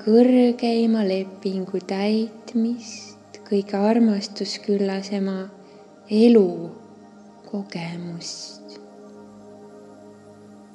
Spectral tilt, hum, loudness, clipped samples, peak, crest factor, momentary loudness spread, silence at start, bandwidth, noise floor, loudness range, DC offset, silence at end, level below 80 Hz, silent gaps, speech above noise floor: -6 dB/octave; none; -22 LUFS; under 0.1%; -4 dBFS; 18 dB; 21 LU; 0 s; 10 kHz; -46 dBFS; 14 LU; under 0.1%; 0.4 s; -78 dBFS; none; 26 dB